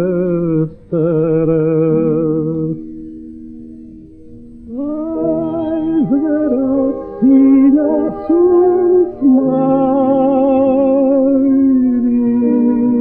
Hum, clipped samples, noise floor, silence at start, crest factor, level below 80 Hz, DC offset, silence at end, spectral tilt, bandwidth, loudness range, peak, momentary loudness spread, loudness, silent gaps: none; under 0.1%; -35 dBFS; 0 s; 12 dB; -44 dBFS; under 0.1%; 0 s; -13 dB/octave; 3.4 kHz; 9 LU; -2 dBFS; 12 LU; -13 LUFS; none